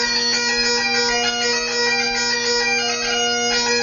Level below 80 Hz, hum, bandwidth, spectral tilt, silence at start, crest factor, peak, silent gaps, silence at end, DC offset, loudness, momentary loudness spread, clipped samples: -48 dBFS; none; 7.4 kHz; 0 dB/octave; 0 s; 12 dB; -8 dBFS; none; 0 s; under 0.1%; -17 LUFS; 2 LU; under 0.1%